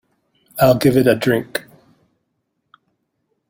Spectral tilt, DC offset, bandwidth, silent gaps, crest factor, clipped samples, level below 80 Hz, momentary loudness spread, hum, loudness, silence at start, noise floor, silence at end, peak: -6 dB/octave; under 0.1%; 16.5 kHz; none; 18 dB; under 0.1%; -50 dBFS; 15 LU; none; -16 LUFS; 0.55 s; -72 dBFS; 1.9 s; -2 dBFS